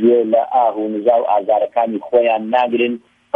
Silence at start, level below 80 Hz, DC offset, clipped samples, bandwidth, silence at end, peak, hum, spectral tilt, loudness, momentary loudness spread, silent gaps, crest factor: 0 s; -68 dBFS; under 0.1%; under 0.1%; 4.6 kHz; 0.35 s; -2 dBFS; none; -8 dB/octave; -16 LUFS; 4 LU; none; 14 dB